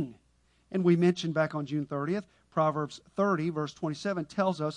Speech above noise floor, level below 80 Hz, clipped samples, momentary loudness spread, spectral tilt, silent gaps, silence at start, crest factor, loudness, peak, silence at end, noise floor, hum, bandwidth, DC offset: 39 dB; -68 dBFS; under 0.1%; 10 LU; -7 dB/octave; none; 0 s; 18 dB; -30 LUFS; -12 dBFS; 0 s; -68 dBFS; none; 9.8 kHz; under 0.1%